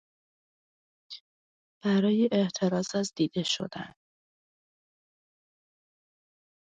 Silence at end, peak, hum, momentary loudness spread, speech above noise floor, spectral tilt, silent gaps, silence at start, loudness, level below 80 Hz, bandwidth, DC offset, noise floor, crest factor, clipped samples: 2.8 s; -14 dBFS; none; 21 LU; over 63 dB; -5.5 dB/octave; 1.20-1.81 s; 1.1 s; -28 LUFS; -74 dBFS; 9.2 kHz; under 0.1%; under -90 dBFS; 18 dB; under 0.1%